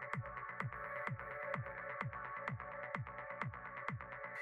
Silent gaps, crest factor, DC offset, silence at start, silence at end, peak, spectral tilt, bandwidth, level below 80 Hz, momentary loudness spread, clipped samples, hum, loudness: none; 22 dB; under 0.1%; 0 s; 0 s; -24 dBFS; -7.5 dB/octave; 12 kHz; -66 dBFS; 3 LU; under 0.1%; none; -45 LUFS